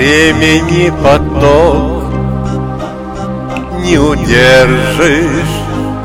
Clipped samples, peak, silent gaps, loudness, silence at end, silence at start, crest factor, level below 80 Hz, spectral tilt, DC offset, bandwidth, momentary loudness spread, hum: 0.2%; 0 dBFS; none; -10 LUFS; 0 s; 0 s; 10 dB; -22 dBFS; -5.5 dB/octave; under 0.1%; 16.5 kHz; 12 LU; none